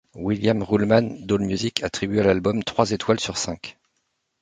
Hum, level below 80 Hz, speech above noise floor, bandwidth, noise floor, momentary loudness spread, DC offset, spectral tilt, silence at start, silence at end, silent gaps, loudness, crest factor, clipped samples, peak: none; -48 dBFS; 52 dB; 9.6 kHz; -74 dBFS; 8 LU; under 0.1%; -5 dB/octave; 0.15 s; 0.7 s; none; -22 LUFS; 22 dB; under 0.1%; 0 dBFS